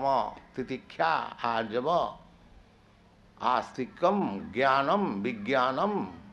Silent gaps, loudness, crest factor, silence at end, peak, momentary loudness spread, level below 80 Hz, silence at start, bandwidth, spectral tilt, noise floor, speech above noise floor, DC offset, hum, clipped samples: none; -29 LUFS; 18 dB; 0 s; -12 dBFS; 11 LU; -62 dBFS; 0 s; 9 kHz; -6.5 dB/octave; -59 dBFS; 30 dB; under 0.1%; none; under 0.1%